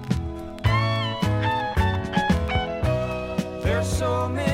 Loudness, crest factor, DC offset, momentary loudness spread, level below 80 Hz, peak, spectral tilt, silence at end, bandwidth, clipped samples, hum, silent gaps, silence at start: -24 LUFS; 14 dB; under 0.1%; 5 LU; -34 dBFS; -8 dBFS; -6 dB/octave; 0 s; 16 kHz; under 0.1%; none; none; 0 s